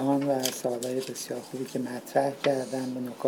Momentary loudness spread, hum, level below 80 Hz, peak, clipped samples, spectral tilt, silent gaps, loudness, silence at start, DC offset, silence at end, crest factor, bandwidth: 9 LU; none; -82 dBFS; -8 dBFS; under 0.1%; -4.5 dB/octave; none; -30 LUFS; 0 s; under 0.1%; 0 s; 20 dB; 19.5 kHz